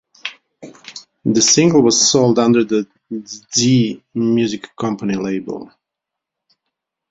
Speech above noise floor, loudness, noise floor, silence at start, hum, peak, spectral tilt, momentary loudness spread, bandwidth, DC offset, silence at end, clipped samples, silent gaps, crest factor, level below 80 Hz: 67 dB; -15 LUFS; -82 dBFS; 0.25 s; none; 0 dBFS; -4 dB/octave; 19 LU; 8 kHz; under 0.1%; 1.45 s; under 0.1%; none; 16 dB; -56 dBFS